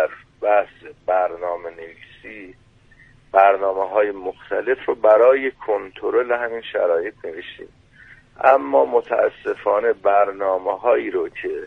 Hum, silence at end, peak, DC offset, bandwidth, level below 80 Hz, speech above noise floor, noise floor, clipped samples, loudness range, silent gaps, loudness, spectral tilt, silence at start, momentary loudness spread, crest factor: none; 0 s; 0 dBFS; under 0.1%; 4.4 kHz; -58 dBFS; 31 dB; -51 dBFS; under 0.1%; 4 LU; none; -19 LUFS; -6 dB/octave; 0 s; 18 LU; 20 dB